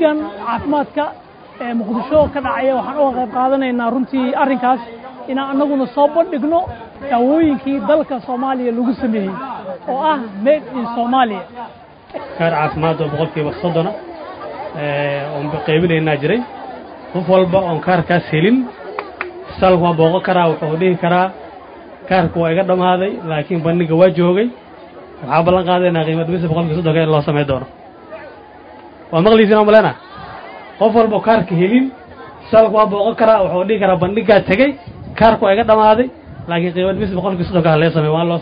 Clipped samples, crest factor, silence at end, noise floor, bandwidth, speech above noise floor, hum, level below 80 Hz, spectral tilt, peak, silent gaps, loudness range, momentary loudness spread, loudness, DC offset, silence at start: under 0.1%; 16 dB; 0 s; -38 dBFS; 5.2 kHz; 23 dB; none; -44 dBFS; -10 dB/octave; 0 dBFS; none; 5 LU; 17 LU; -15 LUFS; under 0.1%; 0 s